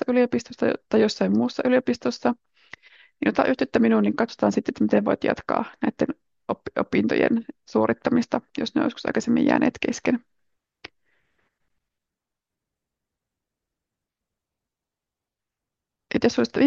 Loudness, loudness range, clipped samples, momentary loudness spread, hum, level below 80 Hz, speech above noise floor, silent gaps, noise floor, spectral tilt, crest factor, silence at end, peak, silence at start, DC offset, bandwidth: -23 LUFS; 7 LU; under 0.1%; 7 LU; none; -62 dBFS; 65 dB; none; -88 dBFS; -6 dB/octave; 20 dB; 0 s; -6 dBFS; 0.1 s; under 0.1%; 7.6 kHz